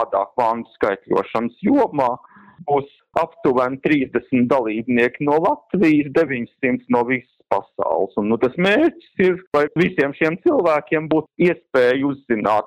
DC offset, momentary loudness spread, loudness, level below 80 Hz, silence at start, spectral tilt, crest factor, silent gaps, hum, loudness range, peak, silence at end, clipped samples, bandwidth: under 0.1%; 6 LU; -19 LUFS; -56 dBFS; 0 s; -7.5 dB/octave; 18 dB; 9.47-9.51 s; none; 2 LU; 0 dBFS; 0 s; under 0.1%; 9.8 kHz